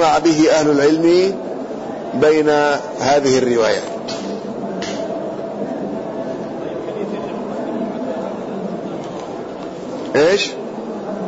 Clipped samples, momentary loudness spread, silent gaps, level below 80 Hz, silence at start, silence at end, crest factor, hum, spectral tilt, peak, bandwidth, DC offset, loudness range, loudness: under 0.1%; 14 LU; none; -54 dBFS; 0 s; 0 s; 14 dB; none; -4.5 dB/octave; -4 dBFS; 8 kHz; under 0.1%; 10 LU; -19 LUFS